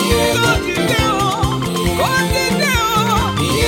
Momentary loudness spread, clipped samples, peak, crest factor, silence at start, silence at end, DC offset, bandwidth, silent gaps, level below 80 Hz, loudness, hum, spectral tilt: 4 LU; under 0.1%; -2 dBFS; 14 dB; 0 s; 0 s; under 0.1%; 17 kHz; none; -28 dBFS; -15 LUFS; none; -4 dB/octave